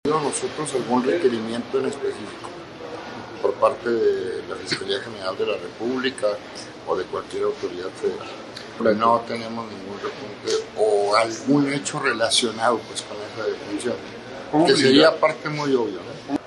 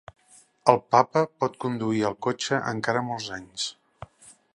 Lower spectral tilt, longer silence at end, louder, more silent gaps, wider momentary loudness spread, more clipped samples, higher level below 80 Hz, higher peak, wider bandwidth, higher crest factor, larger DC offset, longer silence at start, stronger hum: about the same, -4 dB/octave vs -4.5 dB/octave; second, 0 s vs 0.5 s; about the same, -23 LUFS vs -25 LUFS; neither; first, 16 LU vs 12 LU; neither; about the same, -62 dBFS vs -64 dBFS; second, -4 dBFS vs 0 dBFS; about the same, 11.5 kHz vs 11.5 kHz; second, 20 dB vs 26 dB; neither; second, 0.05 s vs 0.65 s; neither